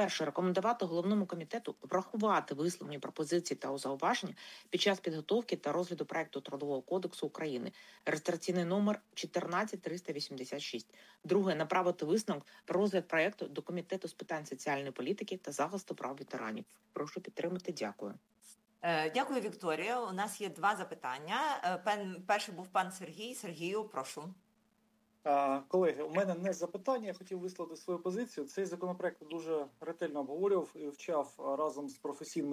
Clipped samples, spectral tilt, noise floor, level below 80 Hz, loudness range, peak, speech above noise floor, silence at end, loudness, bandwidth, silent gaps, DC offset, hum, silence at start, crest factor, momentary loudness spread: under 0.1%; -4.5 dB/octave; -74 dBFS; -88 dBFS; 5 LU; -18 dBFS; 38 dB; 0 s; -37 LUFS; 16 kHz; none; under 0.1%; none; 0 s; 18 dB; 10 LU